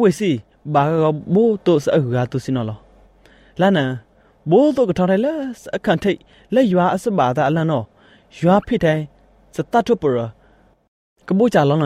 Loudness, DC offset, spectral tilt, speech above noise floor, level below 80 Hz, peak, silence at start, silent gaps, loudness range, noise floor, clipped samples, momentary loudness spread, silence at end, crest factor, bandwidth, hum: -18 LUFS; under 0.1%; -7.5 dB/octave; 37 dB; -50 dBFS; -2 dBFS; 0 s; 10.88-11.16 s; 2 LU; -53 dBFS; under 0.1%; 13 LU; 0 s; 16 dB; 13.5 kHz; none